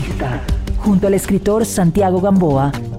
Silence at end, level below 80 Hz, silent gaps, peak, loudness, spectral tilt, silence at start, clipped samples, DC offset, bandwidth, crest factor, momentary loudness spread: 0 s; -26 dBFS; none; -6 dBFS; -16 LUFS; -7 dB/octave; 0 s; under 0.1%; under 0.1%; 16 kHz; 10 dB; 8 LU